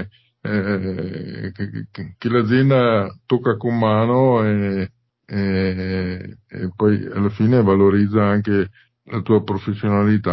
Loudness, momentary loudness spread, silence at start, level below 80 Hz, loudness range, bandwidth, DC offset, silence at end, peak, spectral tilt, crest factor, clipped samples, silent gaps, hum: -19 LUFS; 14 LU; 0 s; -44 dBFS; 3 LU; 5.8 kHz; under 0.1%; 0 s; -4 dBFS; -10.5 dB/octave; 14 dB; under 0.1%; none; none